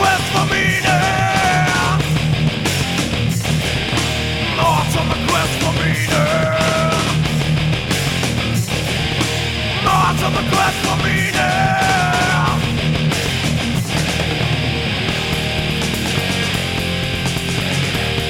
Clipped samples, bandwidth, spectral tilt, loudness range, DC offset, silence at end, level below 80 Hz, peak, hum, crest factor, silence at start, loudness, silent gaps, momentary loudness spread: under 0.1%; 17 kHz; -4.5 dB/octave; 2 LU; under 0.1%; 0 s; -32 dBFS; -2 dBFS; none; 16 dB; 0 s; -16 LUFS; none; 4 LU